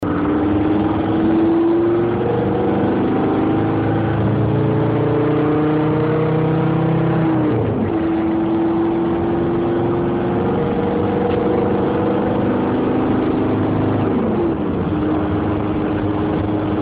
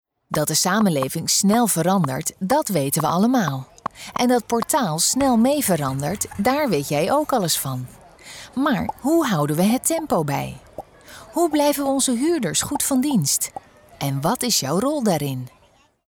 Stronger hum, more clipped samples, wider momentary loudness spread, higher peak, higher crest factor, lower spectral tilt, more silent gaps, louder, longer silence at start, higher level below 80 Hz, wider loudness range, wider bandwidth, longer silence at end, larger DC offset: neither; neither; second, 3 LU vs 11 LU; about the same, -6 dBFS vs -8 dBFS; about the same, 10 dB vs 12 dB; first, -11.5 dB/octave vs -4 dB/octave; neither; about the same, -18 LUFS vs -20 LUFS; second, 0 s vs 0.3 s; first, -38 dBFS vs -52 dBFS; about the same, 1 LU vs 3 LU; second, 4.6 kHz vs over 20 kHz; second, 0 s vs 0.6 s; neither